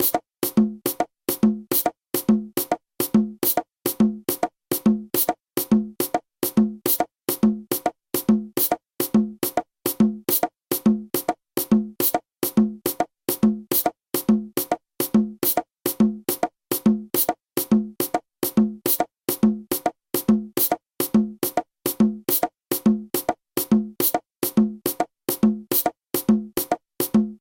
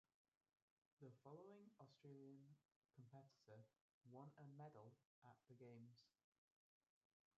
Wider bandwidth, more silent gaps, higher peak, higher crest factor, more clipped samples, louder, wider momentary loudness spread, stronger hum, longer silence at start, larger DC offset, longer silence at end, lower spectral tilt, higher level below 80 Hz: first, 17 kHz vs 7 kHz; second, none vs 2.76-2.82 s, 3.81-4.01 s, 5.05-5.22 s; first, -4 dBFS vs -48 dBFS; about the same, 18 dB vs 20 dB; neither; first, -23 LUFS vs -66 LUFS; about the same, 5 LU vs 6 LU; neither; second, 0 s vs 1 s; neither; second, 0.05 s vs 1.3 s; second, -5 dB/octave vs -7.5 dB/octave; first, -54 dBFS vs under -90 dBFS